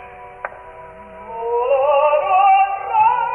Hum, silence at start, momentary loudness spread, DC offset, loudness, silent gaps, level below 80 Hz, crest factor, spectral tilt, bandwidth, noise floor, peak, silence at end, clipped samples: none; 0 s; 24 LU; under 0.1%; -15 LUFS; none; -54 dBFS; 12 dB; -5.5 dB/octave; 3.3 kHz; -37 dBFS; -4 dBFS; 0 s; under 0.1%